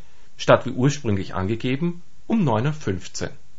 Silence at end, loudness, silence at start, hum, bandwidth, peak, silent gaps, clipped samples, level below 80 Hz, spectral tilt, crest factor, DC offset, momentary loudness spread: 0.25 s; -23 LUFS; 0.4 s; none; 8 kHz; 0 dBFS; none; under 0.1%; -46 dBFS; -6 dB/octave; 22 dB; 3%; 11 LU